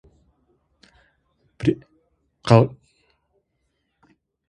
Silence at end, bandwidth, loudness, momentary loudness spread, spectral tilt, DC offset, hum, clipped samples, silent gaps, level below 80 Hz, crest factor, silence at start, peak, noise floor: 1.8 s; 10 kHz; -21 LUFS; 17 LU; -8 dB/octave; under 0.1%; none; under 0.1%; none; -54 dBFS; 26 dB; 1.6 s; 0 dBFS; -73 dBFS